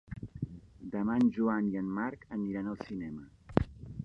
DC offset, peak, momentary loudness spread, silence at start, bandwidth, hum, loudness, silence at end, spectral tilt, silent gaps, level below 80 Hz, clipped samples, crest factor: under 0.1%; -8 dBFS; 15 LU; 0.1 s; 6.8 kHz; none; -34 LUFS; 0 s; -9 dB/octave; none; -52 dBFS; under 0.1%; 26 dB